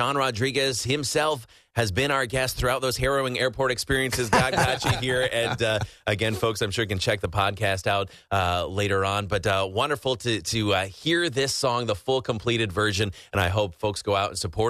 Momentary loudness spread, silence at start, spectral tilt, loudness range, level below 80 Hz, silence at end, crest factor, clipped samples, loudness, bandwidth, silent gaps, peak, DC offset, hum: 3 LU; 0 s; -4 dB/octave; 2 LU; -46 dBFS; 0 s; 16 dB; under 0.1%; -25 LUFS; 14 kHz; none; -8 dBFS; under 0.1%; none